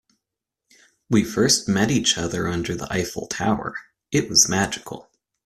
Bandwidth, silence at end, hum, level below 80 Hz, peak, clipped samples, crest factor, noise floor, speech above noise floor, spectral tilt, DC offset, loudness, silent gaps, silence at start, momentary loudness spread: 14.5 kHz; 0.45 s; none; -50 dBFS; -2 dBFS; under 0.1%; 22 dB; -84 dBFS; 63 dB; -3 dB/octave; under 0.1%; -21 LUFS; none; 1.1 s; 15 LU